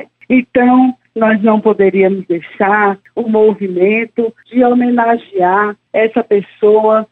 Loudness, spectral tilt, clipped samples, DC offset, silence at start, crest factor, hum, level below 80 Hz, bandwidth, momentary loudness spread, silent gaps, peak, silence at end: -12 LUFS; -9.5 dB/octave; under 0.1%; under 0.1%; 0 s; 10 dB; none; -56 dBFS; 4 kHz; 5 LU; none; 0 dBFS; 0.05 s